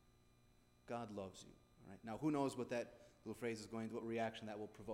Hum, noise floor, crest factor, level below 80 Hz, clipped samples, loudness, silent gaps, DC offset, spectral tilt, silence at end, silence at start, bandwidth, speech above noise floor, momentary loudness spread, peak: none; -72 dBFS; 18 dB; -76 dBFS; under 0.1%; -46 LUFS; none; under 0.1%; -6 dB/octave; 0 s; 0.05 s; 16 kHz; 26 dB; 16 LU; -28 dBFS